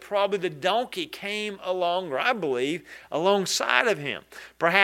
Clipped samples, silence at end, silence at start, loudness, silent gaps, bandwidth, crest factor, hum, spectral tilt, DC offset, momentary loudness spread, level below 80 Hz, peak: under 0.1%; 0 s; 0 s; -26 LUFS; none; 16 kHz; 24 dB; none; -3 dB/octave; under 0.1%; 10 LU; -70 dBFS; -2 dBFS